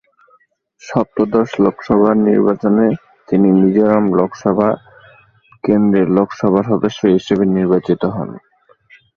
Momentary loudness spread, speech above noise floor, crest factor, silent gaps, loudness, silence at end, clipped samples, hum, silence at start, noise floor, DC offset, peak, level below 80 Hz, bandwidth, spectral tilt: 8 LU; 42 dB; 14 dB; none; -15 LUFS; 0.8 s; under 0.1%; none; 0.85 s; -56 dBFS; under 0.1%; 0 dBFS; -50 dBFS; 7 kHz; -8.5 dB/octave